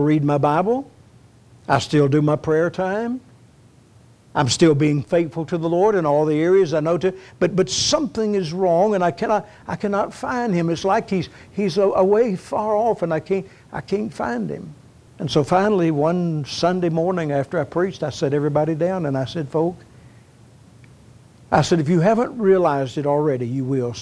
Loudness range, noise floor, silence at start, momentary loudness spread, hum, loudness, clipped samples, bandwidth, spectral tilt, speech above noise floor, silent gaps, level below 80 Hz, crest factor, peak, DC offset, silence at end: 4 LU; -50 dBFS; 0 s; 9 LU; none; -20 LUFS; under 0.1%; 11 kHz; -6 dB/octave; 31 dB; none; -54 dBFS; 18 dB; -2 dBFS; under 0.1%; 0 s